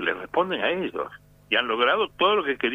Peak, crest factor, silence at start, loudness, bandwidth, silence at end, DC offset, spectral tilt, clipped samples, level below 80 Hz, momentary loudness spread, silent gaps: -6 dBFS; 18 dB; 0 s; -24 LUFS; 15 kHz; 0 s; under 0.1%; -5.5 dB/octave; under 0.1%; -62 dBFS; 9 LU; none